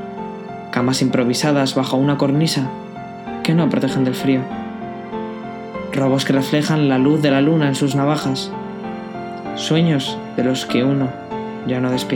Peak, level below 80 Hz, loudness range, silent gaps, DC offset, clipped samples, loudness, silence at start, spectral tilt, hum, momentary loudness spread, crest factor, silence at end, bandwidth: -2 dBFS; -54 dBFS; 3 LU; none; under 0.1%; under 0.1%; -19 LUFS; 0 s; -6 dB/octave; none; 14 LU; 16 dB; 0 s; 18 kHz